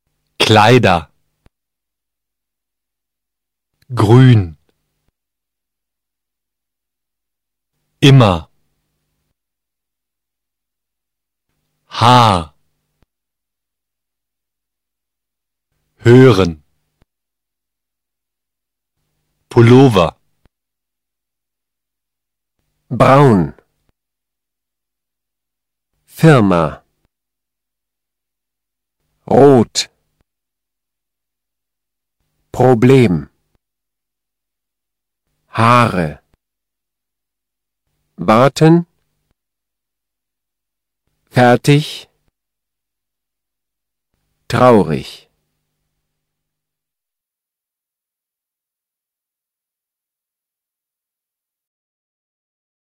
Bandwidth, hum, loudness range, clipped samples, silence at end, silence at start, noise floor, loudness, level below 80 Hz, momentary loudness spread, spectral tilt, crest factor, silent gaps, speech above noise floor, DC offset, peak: 14.5 kHz; none; 4 LU; 0.2%; 7.85 s; 0.4 s; -86 dBFS; -11 LUFS; -46 dBFS; 16 LU; -6.5 dB/octave; 18 dB; none; 77 dB; under 0.1%; 0 dBFS